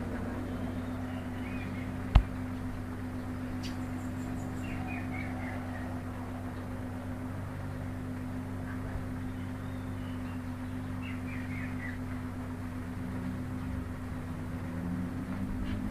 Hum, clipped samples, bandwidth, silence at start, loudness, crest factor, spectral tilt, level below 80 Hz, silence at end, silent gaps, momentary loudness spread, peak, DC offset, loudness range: none; under 0.1%; 15 kHz; 0 s; -37 LUFS; 28 dB; -7.5 dB/octave; -42 dBFS; 0 s; none; 3 LU; -6 dBFS; under 0.1%; 4 LU